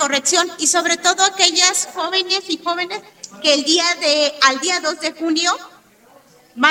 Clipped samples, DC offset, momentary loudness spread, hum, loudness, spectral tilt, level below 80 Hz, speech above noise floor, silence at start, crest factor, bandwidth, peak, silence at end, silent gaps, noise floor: under 0.1%; under 0.1%; 9 LU; none; -16 LUFS; 1 dB/octave; -70 dBFS; 32 dB; 0 s; 18 dB; 17 kHz; 0 dBFS; 0 s; none; -50 dBFS